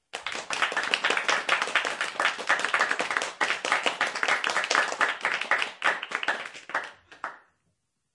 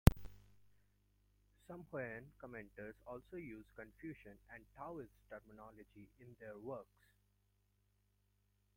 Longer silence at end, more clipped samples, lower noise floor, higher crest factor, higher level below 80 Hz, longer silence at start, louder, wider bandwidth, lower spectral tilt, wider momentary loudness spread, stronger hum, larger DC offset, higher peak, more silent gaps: second, 0.75 s vs 1.95 s; neither; about the same, -76 dBFS vs -79 dBFS; second, 26 dB vs 34 dB; second, -78 dBFS vs -50 dBFS; about the same, 0.15 s vs 0.05 s; first, -26 LUFS vs -49 LUFS; second, 11.5 kHz vs 16.5 kHz; second, 0 dB/octave vs -6.5 dB/octave; second, 10 LU vs 14 LU; second, none vs 50 Hz at -70 dBFS; neither; first, -4 dBFS vs -10 dBFS; neither